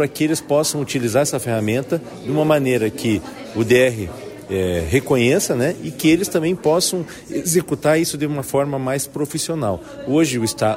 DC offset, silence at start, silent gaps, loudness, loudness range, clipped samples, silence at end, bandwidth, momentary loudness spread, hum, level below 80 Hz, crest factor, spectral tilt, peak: under 0.1%; 0 s; none; -19 LUFS; 2 LU; under 0.1%; 0 s; 16 kHz; 8 LU; none; -46 dBFS; 14 dB; -4.5 dB/octave; -4 dBFS